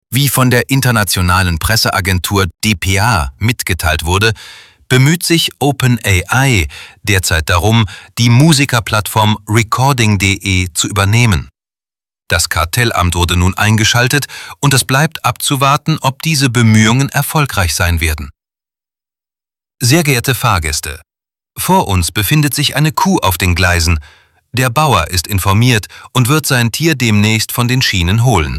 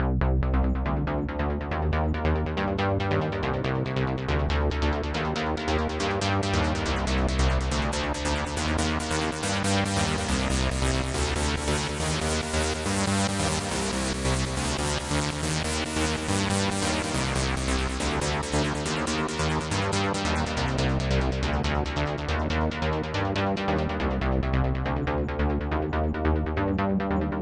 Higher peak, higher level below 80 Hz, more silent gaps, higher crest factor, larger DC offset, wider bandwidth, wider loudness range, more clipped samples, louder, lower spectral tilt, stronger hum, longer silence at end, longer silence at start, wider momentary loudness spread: first, 0 dBFS vs -8 dBFS; about the same, -30 dBFS vs -32 dBFS; neither; second, 12 dB vs 18 dB; neither; first, 16.5 kHz vs 11.5 kHz; about the same, 3 LU vs 1 LU; neither; first, -12 LUFS vs -27 LUFS; about the same, -4 dB/octave vs -5 dB/octave; neither; about the same, 0 s vs 0 s; about the same, 0.1 s vs 0 s; first, 6 LU vs 3 LU